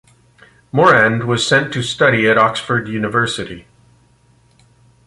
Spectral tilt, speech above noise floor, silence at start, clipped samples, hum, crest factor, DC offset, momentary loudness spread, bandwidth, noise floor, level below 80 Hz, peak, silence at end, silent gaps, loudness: -4.5 dB/octave; 38 dB; 0.75 s; under 0.1%; none; 16 dB; under 0.1%; 11 LU; 11.5 kHz; -53 dBFS; -50 dBFS; 0 dBFS; 1.45 s; none; -14 LUFS